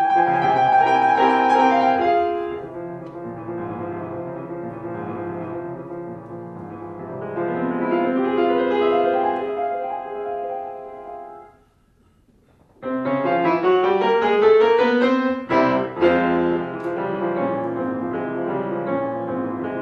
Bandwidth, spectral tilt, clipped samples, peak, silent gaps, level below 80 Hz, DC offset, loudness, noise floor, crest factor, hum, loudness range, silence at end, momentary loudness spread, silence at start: 7.8 kHz; -7 dB/octave; under 0.1%; -4 dBFS; none; -58 dBFS; under 0.1%; -20 LUFS; -58 dBFS; 18 dB; none; 13 LU; 0 s; 17 LU; 0 s